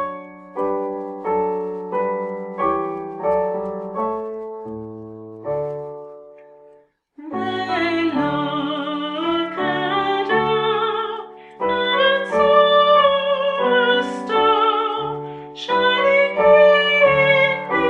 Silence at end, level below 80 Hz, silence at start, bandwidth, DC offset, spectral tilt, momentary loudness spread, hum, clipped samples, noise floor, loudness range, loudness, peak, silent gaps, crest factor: 0 s; -56 dBFS; 0 s; 8.2 kHz; under 0.1%; -5.5 dB/octave; 17 LU; none; under 0.1%; -53 dBFS; 11 LU; -18 LUFS; -2 dBFS; none; 18 dB